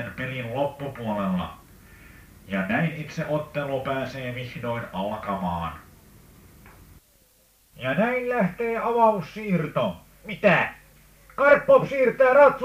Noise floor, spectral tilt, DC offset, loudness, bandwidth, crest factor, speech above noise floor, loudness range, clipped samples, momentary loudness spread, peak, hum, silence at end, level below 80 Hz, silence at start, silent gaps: -60 dBFS; -7 dB/octave; under 0.1%; -24 LUFS; 15.5 kHz; 20 dB; 37 dB; 10 LU; under 0.1%; 14 LU; -4 dBFS; none; 0 s; -54 dBFS; 0 s; none